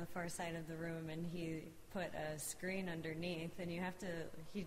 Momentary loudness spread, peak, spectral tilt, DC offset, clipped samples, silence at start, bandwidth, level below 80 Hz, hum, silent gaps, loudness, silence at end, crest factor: 4 LU; -30 dBFS; -5 dB/octave; under 0.1%; under 0.1%; 0 s; 16 kHz; -66 dBFS; none; none; -46 LUFS; 0 s; 14 dB